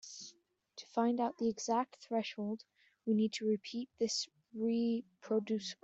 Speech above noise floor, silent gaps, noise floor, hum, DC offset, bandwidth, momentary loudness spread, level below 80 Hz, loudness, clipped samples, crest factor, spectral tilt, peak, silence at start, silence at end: 30 dB; none; -65 dBFS; none; under 0.1%; 8 kHz; 12 LU; -82 dBFS; -37 LUFS; under 0.1%; 18 dB; -4.5 dB/octave; -20 dBFS; 0.05 s; 0.1 s